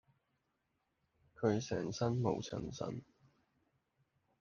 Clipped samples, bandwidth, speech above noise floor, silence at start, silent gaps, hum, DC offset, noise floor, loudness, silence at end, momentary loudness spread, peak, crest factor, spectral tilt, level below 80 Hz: under 0.1%; 7.2 kHz; 46 dB; 1.4 s; none; none; under 0.1%; -83 dBFS; -39 LUFS; 1.35 s; 9 LU; -18 dBFS; 22 dB; -6.5 dB/octave; -68 dBFS